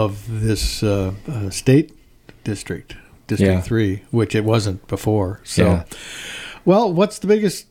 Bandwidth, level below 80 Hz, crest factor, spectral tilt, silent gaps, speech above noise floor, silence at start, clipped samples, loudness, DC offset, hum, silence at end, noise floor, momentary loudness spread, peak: 16 kHz; -36 dBFS; 18 dB; -6 dB/octave; none; 26 dB; 0 s; under 0.1%; -19 LUFS; under 0.1%; none; 0.1 s; -45 dBFS; 14 LU; 0 dBFS